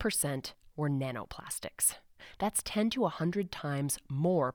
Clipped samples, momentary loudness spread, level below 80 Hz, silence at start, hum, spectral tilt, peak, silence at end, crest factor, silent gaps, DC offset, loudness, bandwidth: under 0.1%; 10 LU; -60 dBFS; 0 s; none; -4.5 dB/octave; -16 dBFS; 0 s; 18 dB; none; under 0.1%; -33 LUFS; over 20 kHz